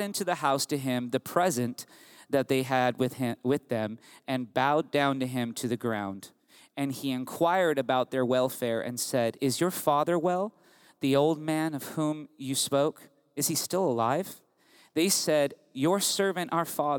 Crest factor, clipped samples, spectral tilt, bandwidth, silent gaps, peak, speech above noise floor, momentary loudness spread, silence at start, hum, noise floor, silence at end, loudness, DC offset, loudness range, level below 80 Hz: 20 dB; under 0.1%; -4 dB/octave; over 20 kHz; none; -10 dBFS; 33 dB; 9 LU; 0 s; none; -61 dBFS; 0 s; -28 LUFS; under 0.1%; 2 LU; -78 dBFS